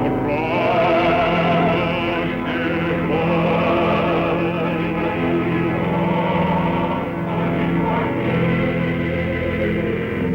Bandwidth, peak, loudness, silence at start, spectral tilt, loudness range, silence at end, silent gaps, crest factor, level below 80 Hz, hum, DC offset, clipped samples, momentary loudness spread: 6.2 kHz; -6 dBFS; -19 LUFS; 0 s; -8.5 dB/octave; 2 LU; 0 s; none; 12 dB; -40 dBFS; none; under 0.1%; under 0.1%; 5 LU